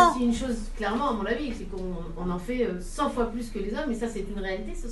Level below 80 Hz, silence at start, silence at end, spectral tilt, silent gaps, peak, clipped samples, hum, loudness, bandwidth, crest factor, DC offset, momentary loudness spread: -38 dBFS; 0 s; 0 s; -5.5 dB/octave; none; -4 dBFS; under 0.1%; none; -30 LUFS; 12 kHz; 22 dB; under 0.1%; 8 LU